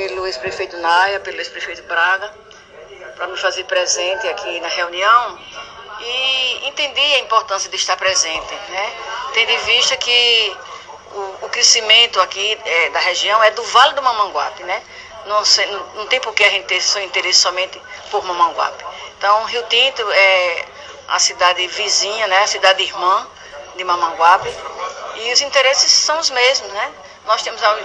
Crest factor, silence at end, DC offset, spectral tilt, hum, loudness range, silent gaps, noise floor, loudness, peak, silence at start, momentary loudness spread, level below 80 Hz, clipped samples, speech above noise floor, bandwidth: 16 dB; 0 s; under 0.1%; 1 dB/octave; none; 5 LU; none; -38 dBFS; -15 LUFS; 0 dBFS; 0 s; 16 LU; -56 dBFS; under 0.1%; 22 dB; 11 kHz